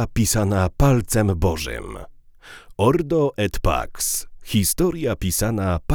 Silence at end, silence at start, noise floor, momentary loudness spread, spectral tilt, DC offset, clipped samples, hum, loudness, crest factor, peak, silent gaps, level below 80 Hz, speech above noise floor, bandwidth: 0 s; 0 s; -44 dBFS; 9 LU; -5 dB/octave; under 0.1%; under 0.1%; none; -21 LUFS; 18 dB; -4 dBFS; none; -32 dBFS; 24 dB; over 20 kHz